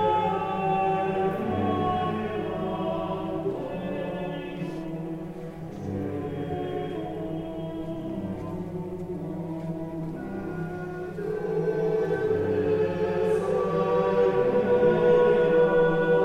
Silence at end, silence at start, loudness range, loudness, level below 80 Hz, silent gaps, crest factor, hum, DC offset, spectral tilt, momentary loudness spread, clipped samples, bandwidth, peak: 0 s; 0 s; 11 LU; -27 LUFS; -52 dBFS; none; 16 dB; none; under 0.1%; -8 dB/octave; 13 LU; under 0.1%; 9.6 kHz; -10 dBFS